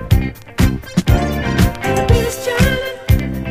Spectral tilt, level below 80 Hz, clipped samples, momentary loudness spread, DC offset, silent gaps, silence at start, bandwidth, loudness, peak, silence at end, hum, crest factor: -6 dB/octave; -22 dBFS; under 0.1%; 4 LU; under 0.1%; none; 0 s; 15.5 kHz; -16 LUFS; 0 dBFS; 0 s; none; 16 dB